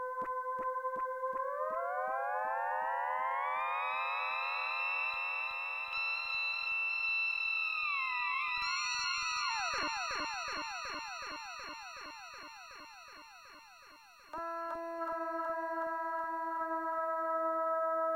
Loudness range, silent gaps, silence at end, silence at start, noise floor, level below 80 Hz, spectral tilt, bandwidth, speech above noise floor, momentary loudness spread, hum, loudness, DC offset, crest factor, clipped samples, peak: 12 LU; none; 0 s; 0 s; -58 dBFS; -72 dBFS; -0.5 dB/octave; 16 kHz; 16 dB; 14 LU; none; -35 LUFS; under 0.1%; 14 dB; under 0.1%; -24 dBFS